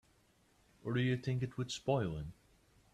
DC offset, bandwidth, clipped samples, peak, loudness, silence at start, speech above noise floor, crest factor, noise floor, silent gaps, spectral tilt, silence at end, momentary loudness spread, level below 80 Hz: under 0.1%; 10.5 kHz; under 0.1%; -20 dBFS; -38 LUFS; 0.85 s; 35 dB; 20 dB; -71 dBFS; none; -6.5 dB/octave; 0.6 s; 12 LU; -62 dBFS